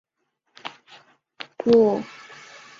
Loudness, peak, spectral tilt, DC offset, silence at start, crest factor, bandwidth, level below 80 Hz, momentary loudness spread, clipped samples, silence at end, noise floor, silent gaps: -20 LUFS; -6 dBFS; -6.5 dB/octave; under 0.1%; 0.65 s; 18 dB; 7.4 kHz; -64 dBFS; 25 LU; under 0.1%; 0.75 s; -75 dBFS; none